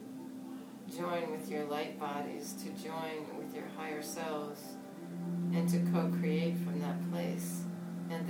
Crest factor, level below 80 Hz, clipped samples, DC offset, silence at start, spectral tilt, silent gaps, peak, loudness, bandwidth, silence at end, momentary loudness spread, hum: 16 dB; -80 dBFS; under 0.1%; under 0.1%; 0 s; -6.5 dB/octave; none; -20 dBFS; -38 LUFS; 19 kHz; 0 s; 14 LU; none